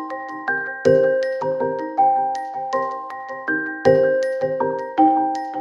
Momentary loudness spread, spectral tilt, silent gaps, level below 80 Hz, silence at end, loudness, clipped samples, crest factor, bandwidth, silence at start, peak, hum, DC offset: 10 LU; -6.5 dB/octave; none; -66 dBFS; 0 s; -20 LUFS; under 0.1%; 18 dB; 10.5 kHz; 0 s; -2 dBFS; none; under 0.1%